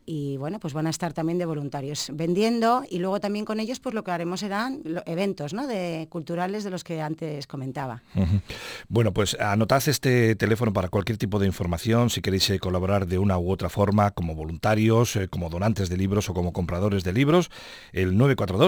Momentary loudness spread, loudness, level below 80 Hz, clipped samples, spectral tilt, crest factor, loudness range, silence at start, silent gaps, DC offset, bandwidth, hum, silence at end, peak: 10 LU; -25 LUFS; -46 dBFS; under 0.1%; -6 dB/octave; 18 dB; 6 LU; 0.05 s; none; under 0.1%; over 20 kHz; none; 0 s; -6 dBFS